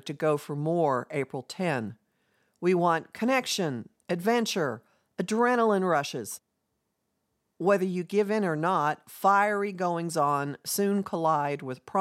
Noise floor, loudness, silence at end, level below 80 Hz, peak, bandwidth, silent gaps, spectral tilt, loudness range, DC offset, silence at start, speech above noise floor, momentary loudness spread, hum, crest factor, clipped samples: -79 dBFS; -27 LUFS; 0 s; -82 dBFS; -10 dBFS; 16.5 kHz; none; -5 dB/octave; 3 LU; under 0.1%; 0.05 s; 52 dB; 10 LU; none; 18 dB; under 0.1%